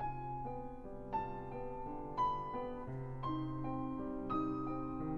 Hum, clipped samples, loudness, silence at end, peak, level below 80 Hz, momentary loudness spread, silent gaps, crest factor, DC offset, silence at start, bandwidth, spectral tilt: none; under 0.1%; -42 LUFS; 0 s; -26 dBFS; -52 dBFS; 8 LU; none; 16 dB; under 0.1%; 0 s; 6.6 kHz; -9 dB/octave